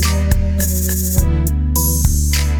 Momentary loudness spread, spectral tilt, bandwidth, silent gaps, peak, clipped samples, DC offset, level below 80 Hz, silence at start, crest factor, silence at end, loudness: 2 LU; -4.5 dB/octave; over 20 kHz; none; 0 dBFS; under 0.1%; 0.3%; -16 dBFS; 0 s; 14 dB; 0 s; -16 LUFS